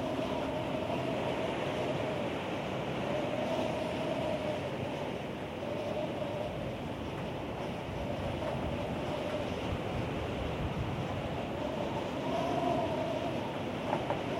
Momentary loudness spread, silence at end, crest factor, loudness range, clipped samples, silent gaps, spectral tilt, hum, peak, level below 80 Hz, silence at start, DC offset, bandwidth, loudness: 5 LU; 0 s; 18 dB; 3 LU; under 0.1%; none; -6.5 dB/octave; none; -16 dBFS; -52 dBFS; 0 s; under 0.1%; 16 kHz; -35 LUFS